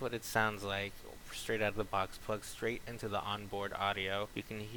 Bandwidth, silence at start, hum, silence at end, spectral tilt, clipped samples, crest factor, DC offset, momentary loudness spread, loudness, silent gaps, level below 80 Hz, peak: 19 kHz; 0 s; none; 0 s; -4 dB/octave; under 0.1%; 22 dB; under 0.1%; 9 LU; -38 LUFS; none; -56 dBFS; -16 dBFS